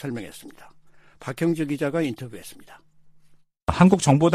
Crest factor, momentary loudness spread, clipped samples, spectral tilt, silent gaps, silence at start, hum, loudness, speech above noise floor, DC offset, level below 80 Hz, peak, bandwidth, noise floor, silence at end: 20 dB; 23 LU; under 0.1%; -6.5 dB/octave; none; 0 s; none; -22 LUFS; 32 dB; under 0.1%; -46 dBFS; -4 dBFS; 14.5 kHz; -54 dBFS; 0 s